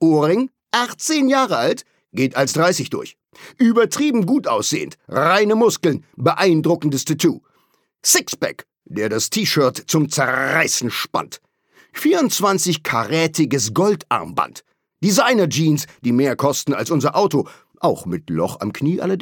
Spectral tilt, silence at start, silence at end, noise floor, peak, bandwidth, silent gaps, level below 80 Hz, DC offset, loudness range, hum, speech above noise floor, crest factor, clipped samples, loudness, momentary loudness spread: -4 dB/octave; 0 s; 0 s; -63 dBFS; -2 dBFS; 19 kHz; none; -64 dBFS; under 0.1%; 2 LU; none; 45 dB; 16 dB; under 0.1%; -18 LUFS; 9 LU